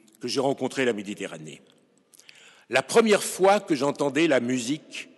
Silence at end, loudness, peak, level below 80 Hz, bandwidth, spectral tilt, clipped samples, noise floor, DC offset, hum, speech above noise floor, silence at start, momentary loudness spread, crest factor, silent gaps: 0.15 s; -24 LUFS; -6 dBFS; -76 dBFS; 12 kHz; -4 dB/octave; under 0.1%; -58 dBFS; under 0.1%; none; 34 dB; 0.2 s; 14 LU; 20 dB; none